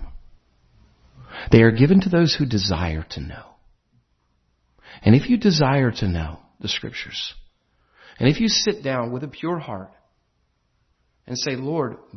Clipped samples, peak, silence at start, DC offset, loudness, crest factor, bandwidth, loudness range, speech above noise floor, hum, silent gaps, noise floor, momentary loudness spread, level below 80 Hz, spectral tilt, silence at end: under 0.1%; 0 dBFS; 0 s; under 0.1%; -20 LUFS; 22 dB; 6.4 kHz; 5 LU; 48 dB; none; none; -68 dBFS; 18 LU; -42 dBFS; -5.5 dB/octave; 0 s